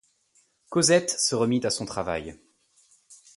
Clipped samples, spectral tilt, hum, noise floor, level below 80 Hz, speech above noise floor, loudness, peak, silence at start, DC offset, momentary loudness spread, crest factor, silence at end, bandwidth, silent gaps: under 0.1%; -3.5 dB/octave; none; -66 dBFS; -58 dBFS; 42 dB; -24 LUFS; -8 dBFS; 0.7 s; under 0.1%; 11 LU; 20 dB; 0.2 s; 11.5 kHz; none